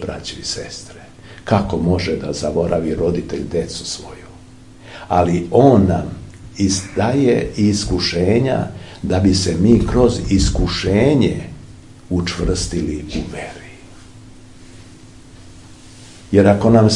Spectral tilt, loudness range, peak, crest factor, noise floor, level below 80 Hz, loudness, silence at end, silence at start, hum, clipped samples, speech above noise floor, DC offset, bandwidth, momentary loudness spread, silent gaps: -6 dB/octave; 9 LU; 0 dBFS; 18 dB; -41 dBFS; -32 dBFS; -17 LUFS; 0 s; 0 s; none; under 0.1%; 25 dB; 0.4%; 11.5 kHz; 18 LU; none